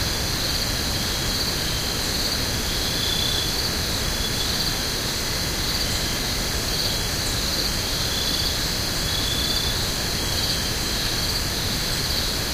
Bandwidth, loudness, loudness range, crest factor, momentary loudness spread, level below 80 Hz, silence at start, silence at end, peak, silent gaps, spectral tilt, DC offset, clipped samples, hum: 16 kHz; -22 LUFS; 1 LU; 14 dB; 2 LU; -32 dBFS; 0 s; 0 s; -10 dBFS; none; -2.5 dB/octave; under 0.1%; under 0.1%; none